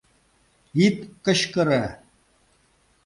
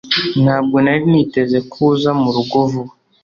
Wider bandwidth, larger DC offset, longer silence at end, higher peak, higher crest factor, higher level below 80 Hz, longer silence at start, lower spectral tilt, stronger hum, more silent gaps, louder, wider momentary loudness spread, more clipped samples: first, 11.5 kHz vs 7 kHz; neither; first, 1.1 s vs 0.35 s; second, -6 dBFS vs -2 dBFS; first, 20 dB vs 12 dB; about the same, -56 dBFS vs -52 dBFS; first, 0.75 s vs 0.05 s; second, -5 dB/octave vs -7.5 dB/octave; neither; neither; second, -23 LUFS vs -15 LUFS; first, 8 LU vs 5 LU; neither